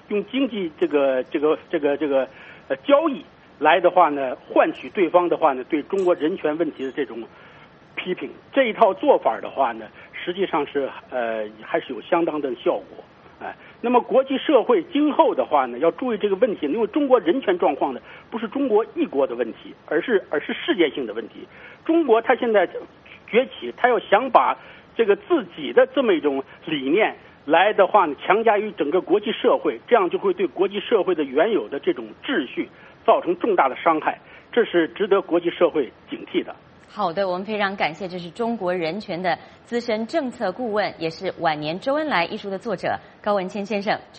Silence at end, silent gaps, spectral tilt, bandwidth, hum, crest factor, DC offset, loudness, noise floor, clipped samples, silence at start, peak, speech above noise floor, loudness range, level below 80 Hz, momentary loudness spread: 0 s; none; -6.5 dB/octave; 8.2 kHz; none; 22 dB; under 0.1%; -22 LUFS; -48 dBFS; under 0.1%; 0.1 s; 0 dBFS; 26 dB; 5 LU; -66 dBFS; 11 LU